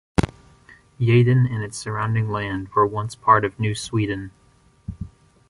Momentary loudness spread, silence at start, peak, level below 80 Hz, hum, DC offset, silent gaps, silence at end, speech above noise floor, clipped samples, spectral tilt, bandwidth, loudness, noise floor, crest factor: 20 LU; 0.2 s; -2 dBFS; -42 dBFS; none; under 0.1%; none; 0.4 s; 31 dB; under 0.1%; -6.5 dB/octave; 11.5 kHz; -21 LUFS; -51 dBFS; 20 dB